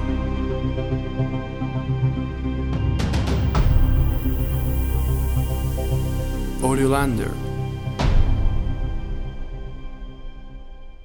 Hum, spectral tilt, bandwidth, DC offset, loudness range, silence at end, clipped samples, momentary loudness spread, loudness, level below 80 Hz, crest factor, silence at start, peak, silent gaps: none; -7 dB/octave; over 20 kHz; under 0.1%; 5 LU; 0 s; under 0.1%; 16 LU; -24 LUFS; -24 dBFS; 18 dB; 0 s; -4 dBFS; none